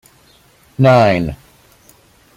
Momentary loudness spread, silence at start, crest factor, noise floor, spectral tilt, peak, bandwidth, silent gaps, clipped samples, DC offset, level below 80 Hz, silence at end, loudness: 24 LU; 0.8 s; 16 dB; -50 dBFS; -7.5 dB/octave; -2 dBFS; 15 kHz; none; under 0.1%; under 0.1%; -44 dBFS; 1 s; -13 LUFS